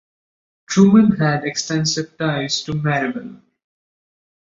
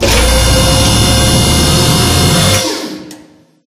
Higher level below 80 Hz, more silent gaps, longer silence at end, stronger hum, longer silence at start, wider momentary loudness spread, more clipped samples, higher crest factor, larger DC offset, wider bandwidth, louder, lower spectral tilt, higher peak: second, -54 dBFS vs -18 dBFS; neither; first, 1.15 s vs 0.5 s; neither; first, 0.7 s vs 0 s; about the same, 11 LU vs 9 LU; second, under 0.1% vs 0.1%; first, 18 dB vs 10 dB; neither; second, 7.8 kHz vs 16 kHz; second, -17 LUFS vs -9 LUFS; first, -5 dB/octave vs -3.5 dB/octave; about the same, -2 dBFS vs 0 dBFS